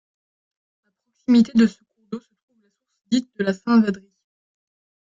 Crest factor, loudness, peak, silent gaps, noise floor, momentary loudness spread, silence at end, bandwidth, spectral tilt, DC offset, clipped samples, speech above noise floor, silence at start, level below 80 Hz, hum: 16 dB; -20 LUFS; -6 dBFS; 2.43-2.48 s; -68 dBFS; 19 LU; 1.1 s; 7.6 kHz; -6.5 dB/octave; under 0.1%; under 0.1%; 50 dB; 1.3 s; -66 dBFS; none